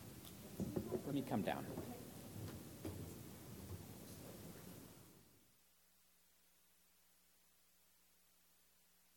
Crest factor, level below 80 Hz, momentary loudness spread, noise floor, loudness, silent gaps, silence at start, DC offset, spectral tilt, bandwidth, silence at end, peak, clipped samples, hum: 26 dB; -70 dBFS; 16 LU; -74 dBFS; -49 LUFS; none; 0 s; under 0.1%; -5.5 dB/octave; 17.5 kHz; 0.15 s; -26 dBFS; under 0.1%; none